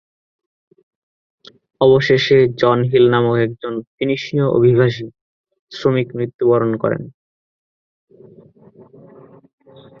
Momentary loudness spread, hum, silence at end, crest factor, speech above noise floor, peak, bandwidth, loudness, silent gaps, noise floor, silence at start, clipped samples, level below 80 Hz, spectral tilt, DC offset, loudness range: 14 LU; none; 2.9 s; 16 dB; 31 dB; -2 dBFS; 6.8 kHz; -16 LUFS; 3.87-3.98 s, 5.21-5.44 s, 5.59-5.67 s, 6.34-6.39 s; -46 dBFS; 1.8 s; under 0.1%; -54 dBFS; -7.5 dB/octave; under 0.1%; 8 LU